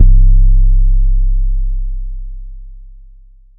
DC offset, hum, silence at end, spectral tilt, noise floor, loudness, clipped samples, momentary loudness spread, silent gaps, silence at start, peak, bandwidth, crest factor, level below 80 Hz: under 0.1%; none; 0.8 s; -14.5 dB/octave; -40 dBFS; -16 LUFS; 0.5%; 21 LU; none; 0 s; 0 dBFS; 0.4 kHz; 10 dB; -10 dBFS